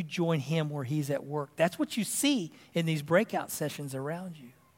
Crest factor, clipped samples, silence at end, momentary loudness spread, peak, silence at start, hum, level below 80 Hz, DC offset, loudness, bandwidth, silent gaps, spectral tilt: 20 dB; under 0.1%; 0.25 s; 9 LU; -10 dBFS; 0 s; none; -78 dBFS; under 0.1%; -31 LUFS; 16.5 kHz; none; -5 dB/octave